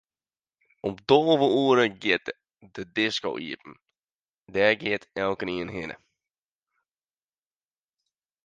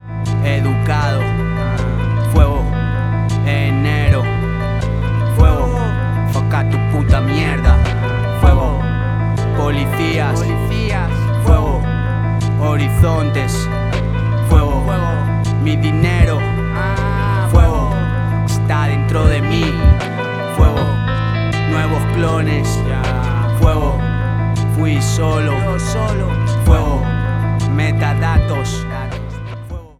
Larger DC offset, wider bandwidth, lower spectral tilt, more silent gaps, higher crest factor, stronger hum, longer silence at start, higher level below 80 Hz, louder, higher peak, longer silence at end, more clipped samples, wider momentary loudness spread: neither; second, 9 kHz vs 13.5 kHz; second, -5 dB/octave vs -7 dB/octave; first, 4.13-4.24 s, 4.34-4.44 s vs none; first, 24 dB vs 14 dB; neither; first, 0.85 s vs 0.05 s; second, -64 dBFS vs -20 dBFS; second, -25 LUFS vs -16 LUFS; second, -4 dBFS vs 0 dBFS; first, 2.5 s vs 0.1 s; neither; first, 18 LU vs 5 LU